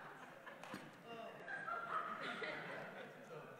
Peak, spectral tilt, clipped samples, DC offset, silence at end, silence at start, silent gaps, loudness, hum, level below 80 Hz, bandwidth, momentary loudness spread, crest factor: -32 dBFS; -4.5 dB/octave; under 0.1%; under 0.1%; 0 s; 0 s; none; -48 LUFS; none; under -90 dBFS; 16 kHz; 11 LU; 18 dB